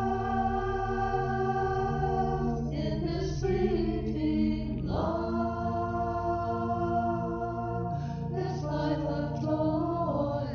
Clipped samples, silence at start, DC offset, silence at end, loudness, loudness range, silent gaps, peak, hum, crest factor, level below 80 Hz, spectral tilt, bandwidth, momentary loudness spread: under 0.1%; 0 s; under 0.1%; 0 s; -30 LUFS; 2 LU; none; -16 dBFS; none; 14 dB; -42 dBFS; -8 dB/octave; 6.8 kHz; 4 LU